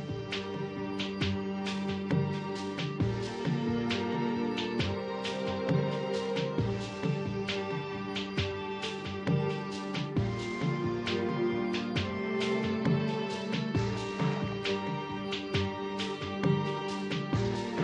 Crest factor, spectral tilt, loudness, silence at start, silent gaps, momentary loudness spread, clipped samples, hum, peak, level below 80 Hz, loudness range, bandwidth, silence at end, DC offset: 16 dB; -6.5 dB/octave; -33 LUFS; 0 s; none; 5 LU; under 0.1%; none; -16 dBFS; -56 dBFS; 2 LU; 10 kHz; 0 s; under 0.1%